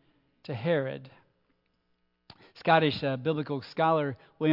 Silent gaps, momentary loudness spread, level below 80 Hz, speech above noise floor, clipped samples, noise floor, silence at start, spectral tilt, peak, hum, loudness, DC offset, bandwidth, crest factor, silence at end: none; 14 LU; -72 dBFS; 47 dB; under 0.1%; -74 dBFS; 0.5 s; -8.5 dB/octave; -8 dBFS; none; -28 LUFS; under 0.1%; 5.8 kHz; 22 dB; 0 s